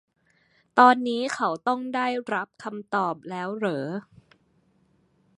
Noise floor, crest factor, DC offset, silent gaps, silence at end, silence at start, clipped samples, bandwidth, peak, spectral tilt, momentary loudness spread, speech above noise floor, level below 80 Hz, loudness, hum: -65 dBFS; 24 dB; under 0.1%; none; 1.4 s; 0.75 s; under 0.1%; 11 kHz; -2 dBFS; -5 dB/octave; 16 LU; 41 dB; -76 dBFS; -25 LUFS; none